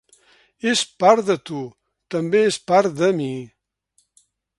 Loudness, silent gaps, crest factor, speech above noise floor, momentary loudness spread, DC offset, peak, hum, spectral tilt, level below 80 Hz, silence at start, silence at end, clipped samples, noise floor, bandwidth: -19 LUFS; none; 22 dB; 47 dB; 15 LU; under 0.1%; 0 dBFS; none; -4.5 dB/octave; -68 dBFS; 0.65 s; 1.15 s; under 0.1%; -66 dBFS; 11.5 kHz